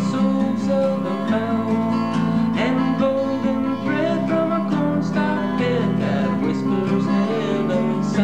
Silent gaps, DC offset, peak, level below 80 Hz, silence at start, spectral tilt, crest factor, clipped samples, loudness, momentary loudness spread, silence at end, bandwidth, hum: none; 0.6%; -8 dBFS; -52 dBFS; 0 s; -7.5 dB/octave; 12 dB; under 0.1%; -20 LUFS; 2 LU; 0 s; 9 kHz; none